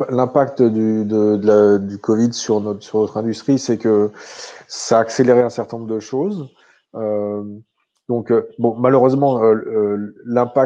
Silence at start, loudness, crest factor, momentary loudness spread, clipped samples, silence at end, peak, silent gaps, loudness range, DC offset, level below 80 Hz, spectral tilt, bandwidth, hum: 0 s; -17 LUFS; 16 dB; 13 LU; under 0.1%; 0 s; -2 dBFS; none; 4 LU; under 0.1%; -66 dBFS; -6.5 dB/octave; 9 kHz; none